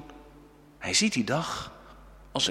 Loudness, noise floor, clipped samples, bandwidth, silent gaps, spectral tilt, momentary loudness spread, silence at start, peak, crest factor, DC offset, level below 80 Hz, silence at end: -28 LUFS; -53 dBFS; under 0.1%; 15.5 kHz; none; -2.5 dB/octave; 17 LU; 0 s; -10 dBFS; 22 dB; under 0.1%; -56 dBFS; 0 s